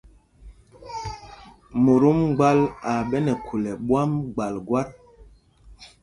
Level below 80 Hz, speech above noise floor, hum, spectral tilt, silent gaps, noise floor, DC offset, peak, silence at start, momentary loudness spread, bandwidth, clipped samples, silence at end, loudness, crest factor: -50 dBFS; 30 dB; none; -8 dB/octave; none; -51 dBFS; under 0.1%; -4 dBFS; 0.45 s; 17 LU; 11.5 kHz; under 0.1%; 0.15 s; -22 LUFS; 20 dB